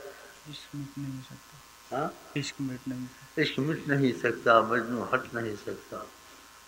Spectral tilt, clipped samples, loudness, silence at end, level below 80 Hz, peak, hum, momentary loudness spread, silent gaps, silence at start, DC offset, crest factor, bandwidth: -5.5 dB/octave; under 0.1%; -30 LUFS; 0 s; -66 dBFS; -8 dBFS; none; 24 LU; none; 0 s; under 0.1%; 24 dB; 16 kHz